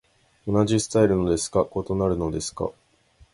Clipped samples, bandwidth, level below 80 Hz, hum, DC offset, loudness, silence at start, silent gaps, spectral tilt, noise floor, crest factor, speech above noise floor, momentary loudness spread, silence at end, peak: under 0.1%; 11.5 kHz; -44 dBFS; none; under 0.1%; -24 LUFS; 0.45 s; none; -5.5 dB/octave; -58 dBFS; 18 dB; 35 dB; 11 LU; 0.6 s; -6 dBFS